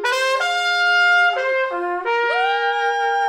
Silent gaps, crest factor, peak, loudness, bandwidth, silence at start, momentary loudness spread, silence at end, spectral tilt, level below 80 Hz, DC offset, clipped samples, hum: none; 12 dB; -8 dBFS; -18 LUFS; 16 kHz; 0 s; 7 LU; 0 s; 0.5 dB/octave; -68 dBFS; under 0.1%; under 0.1%; none